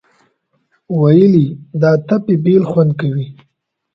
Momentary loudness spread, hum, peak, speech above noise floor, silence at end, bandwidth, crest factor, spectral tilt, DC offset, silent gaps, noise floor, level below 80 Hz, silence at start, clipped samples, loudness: 11 LU; none; 0 dBFS; 55 dB; 0.65 s; 6 kHz; 14 dB; -10.5 dB/octave; under 0.1%; none; -67 dBFS; -54 dBFS; 0.9 s; under 0.1%; -13 LUFS